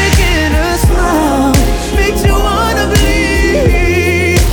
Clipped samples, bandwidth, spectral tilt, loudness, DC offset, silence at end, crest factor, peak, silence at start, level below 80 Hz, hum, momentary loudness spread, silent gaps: under 0.1%; over 20 kHz; -5 dB/octave; -11 LUFS; under 0.1%; 0 s; 10 dB; 0 dBFS; 0 s; -14 dBFS; none; 2 LU; none